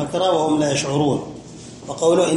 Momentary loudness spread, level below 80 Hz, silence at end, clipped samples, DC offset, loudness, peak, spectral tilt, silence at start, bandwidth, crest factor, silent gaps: 19 LU; -54 dBFS; 0 s; under 0.1%; under 0.1%; -19 LUFS; -6 dBFS; -5 dB/octave; 0 s; 11.5 kHz; 14 dB; none